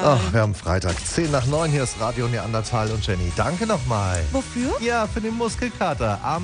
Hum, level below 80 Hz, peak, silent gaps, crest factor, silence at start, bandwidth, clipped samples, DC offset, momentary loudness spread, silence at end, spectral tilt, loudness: none; -36 dBFS; -6 dBFS; none; 16 dB; 0 s; 10 kHz; under 0.1%; under 0.1%; 4 LU; 0 s; -5.5 dB/octave; -23 LUFS